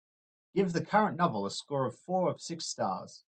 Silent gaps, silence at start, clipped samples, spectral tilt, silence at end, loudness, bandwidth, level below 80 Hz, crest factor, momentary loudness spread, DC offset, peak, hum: none; 0.55 s; under 0.1%; -5 dB/octave; 0.1 s; -32 LUFS; 9.2 kHz; -72 dBFS; 20 dB; 8 LU; under 0.1%; -12 dBFS; none